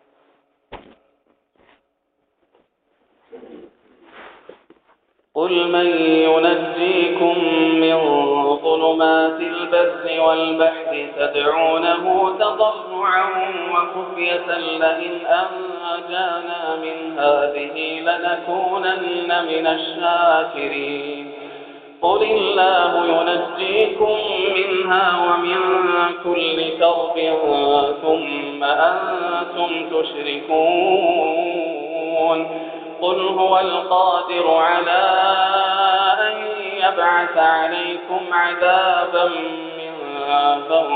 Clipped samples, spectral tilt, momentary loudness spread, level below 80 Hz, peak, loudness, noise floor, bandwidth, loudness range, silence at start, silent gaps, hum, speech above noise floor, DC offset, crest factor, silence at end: under 0.1%; -0.5 dB/octave; 9 LU; -62 dBFS; -4 dBFS; -18 LUFS; -70 dBFS; 4.7 kHz; 5 LU; 0.7 s; none; none; 52 dB; under 0.1%; 16 dB; 0 s